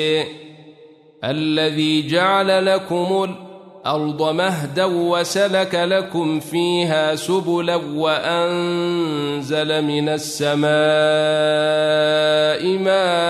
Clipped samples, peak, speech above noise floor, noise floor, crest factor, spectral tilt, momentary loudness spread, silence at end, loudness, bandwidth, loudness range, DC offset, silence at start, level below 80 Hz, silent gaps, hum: under 0.1%; -4 dBFS; 28 dB; -46 dBFS; 14 dB; -4.5 dB/octave; 6 LU; 0 s; -18 LUFS; 13.5 kHz; 3 LU; under 0.1%; 0 s; -66 dBFS; none; none